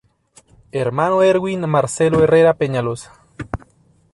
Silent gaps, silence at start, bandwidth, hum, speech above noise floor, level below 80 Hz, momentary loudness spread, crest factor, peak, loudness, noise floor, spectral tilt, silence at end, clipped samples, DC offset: none; 0.75 s; 11.5 kHz; none; 39 dB; -44 dBFS; 17 LU; 14 dB; -4 dBFS; -16 LUFS; -55 dBFS; -6 dB/octave; 0.6 s; under 0.1%; under 0.1%